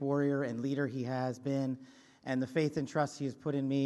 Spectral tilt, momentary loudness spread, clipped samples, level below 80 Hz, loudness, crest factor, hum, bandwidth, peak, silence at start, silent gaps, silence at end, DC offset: -7 dB/octave; 6 LU; under 0.1%; -74 dBFS; -35 LUFS; 16 dB; none; 11.5 kHz; -18 dBFS; 0 s; none; 0 s; under 0.1%